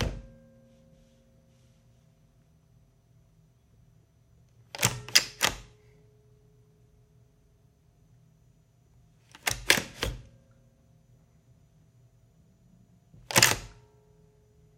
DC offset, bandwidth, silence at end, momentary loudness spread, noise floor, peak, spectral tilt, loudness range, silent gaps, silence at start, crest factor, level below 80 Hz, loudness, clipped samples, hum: under 0.1%; 16.5 kHz; 1.05 s; 25 LU; -63 dBFS; -2 dBFS; -1.5 dB/octave; 8 LU; none; 0 s; 34 dB; -52 dBFS; -26 LUFS; under 0.1%; none